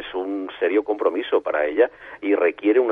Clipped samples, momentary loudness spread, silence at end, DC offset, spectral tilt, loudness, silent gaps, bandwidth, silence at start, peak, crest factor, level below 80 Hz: under 0.1%; 8 LU; 0 s; under 0.1%; -6.5 dB/octave; -22 LUFS; none; 3.8 kHz; 0 s; -4 dBFS; 16 dB; -62 dBFS